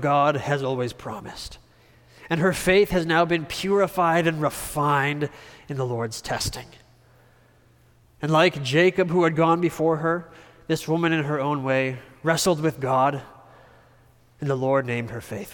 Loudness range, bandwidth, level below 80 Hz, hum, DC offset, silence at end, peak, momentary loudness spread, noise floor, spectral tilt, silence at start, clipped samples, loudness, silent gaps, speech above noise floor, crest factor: 5 LU; 19 kHz; -50 dBFS; none; under 0.1%; 0 s; -6 dBFS; 13 LU; -57 dBFS; -5.5 dB/octave; 0 s; under 0.1%; -23 LUFS; none; 34 dB; 18 dB